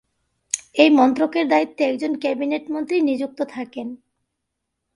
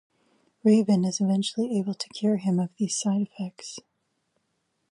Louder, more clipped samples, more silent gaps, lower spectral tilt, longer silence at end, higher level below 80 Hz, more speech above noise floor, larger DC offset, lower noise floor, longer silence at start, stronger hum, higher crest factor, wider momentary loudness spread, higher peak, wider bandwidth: first, -20 LUFS vs -26 LUFS; neither; neither; second, -3 dB/octave vs -6 dB/octave; second, 1 s vs 1.15 s; first, -68 dBFS vs -76 dBFS; first, 59 dB vs 51 dB; neither; about the same, -78 dBFS vs -75 dBFS; about the same, 0.55 s vs 0.65 s; neither; about the same, 20 dB vs 16 dB; about the same, 14 LU vs 14 LU; first, 0 dBFS vs -10 dBFS; about the same, 11 kHz vs 11.5 kHz